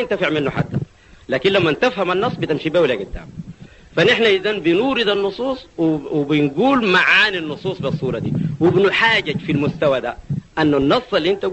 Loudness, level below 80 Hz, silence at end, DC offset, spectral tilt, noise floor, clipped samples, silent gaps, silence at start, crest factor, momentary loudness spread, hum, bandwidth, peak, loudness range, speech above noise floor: -17 LUFS; -46 dBFS; 0 s; under 0.1%; -6 dB/octave; -39 dBFS; under 0.1%; none; 0 s; 16 dB; 11 LU; none; 8.4 kHz; -2 dBFS; 3 LU; 22 dB